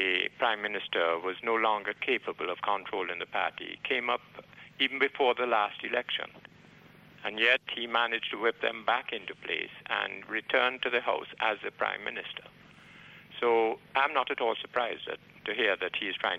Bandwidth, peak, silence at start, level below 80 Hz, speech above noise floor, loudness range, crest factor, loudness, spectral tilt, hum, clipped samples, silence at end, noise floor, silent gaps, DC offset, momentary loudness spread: 8.4 kHz; -12 dBFS; 0 s; -74 dBFS; 25 dB; 2 LU; 20 dB; -30 LUFS; -4 dB/octave; none; under 0.1%; 0 s; -56 dBFS; none; under 0.1%; 11 LU